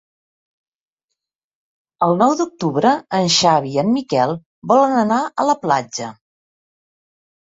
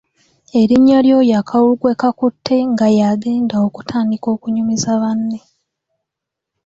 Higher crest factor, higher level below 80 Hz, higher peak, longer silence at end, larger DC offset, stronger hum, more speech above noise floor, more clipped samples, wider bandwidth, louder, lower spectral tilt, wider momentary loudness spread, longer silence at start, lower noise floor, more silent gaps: first, 18 dB vs 12 dB; second, -62 dBFS vs -54 dBFS; about the same, -2 dBFS vs -2 dBFS; first, 1.45 s vs 1.3 s; neither; neither; second, 64 dB vs 68 dB; neither; about the same, 8 kHz vs 7.8 kHz; about the same, -17 LUFS vs -15 LUFS; second, -4.5 dB/octave vs -6 dB/octave; about the same, 7 LU vs 9 LU; first, 2 s vs 0.55 s; about the same, -81 dBFS vs -81 dBFS; first, 4.46-4.62 s vs none